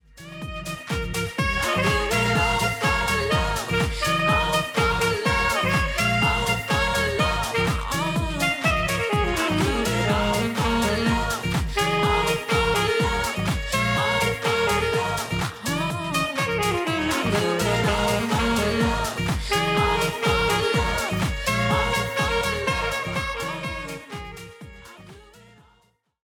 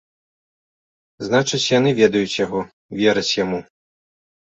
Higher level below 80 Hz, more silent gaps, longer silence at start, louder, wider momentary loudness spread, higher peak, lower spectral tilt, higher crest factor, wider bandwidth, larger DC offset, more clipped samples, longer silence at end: first, -36 dBFS vs -58 dBFS; second, none vs 2.73-2.89 s; second, 0.15 s vs 1.2 s; second, -23 LUFS vs -19 LUFS; second, 6 LU vs 12 LU; second, -8 dBFS vs -2 dBFS; about the same, -4.5 dB/octave vs -4.5 dB/octave; about the same, 16 dB vs 18 dB; first, 19 kHz vs 8.2 kHz; neither; neither; about the same, 0.85 s vs 0.9 s